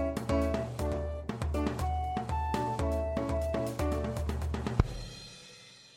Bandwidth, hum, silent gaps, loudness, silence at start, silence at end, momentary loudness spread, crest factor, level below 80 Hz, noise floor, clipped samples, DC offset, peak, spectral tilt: 16 kHz; none; none; -33 LUFS; 0 s; 0.05 s; 12 LU; 22 dB; -38 dBFS; -54 dBFS; under 0.1%; under 0.1%; -10 dBFS; -7 dB/octave